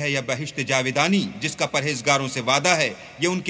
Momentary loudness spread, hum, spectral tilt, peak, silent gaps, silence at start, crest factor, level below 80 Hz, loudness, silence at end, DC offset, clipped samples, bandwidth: 7 LU; none; -3.5 dB/octave; -2 dBFS; none; 0 s; 20 dB; -60 dBFS; -22 LUFS; 0 s; under 0.1%; under 0.1%; 8 kHz